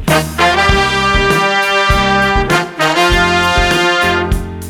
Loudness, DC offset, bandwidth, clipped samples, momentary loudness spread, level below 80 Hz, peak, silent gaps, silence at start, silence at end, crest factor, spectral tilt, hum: -11 LUFS; under 0.1%; over 20 kHz; under 0.1%; 3 LU; -22 dBFS; 0 dBFS; none; 0 s; 0 s; 12 dB; -4 dB/octave; none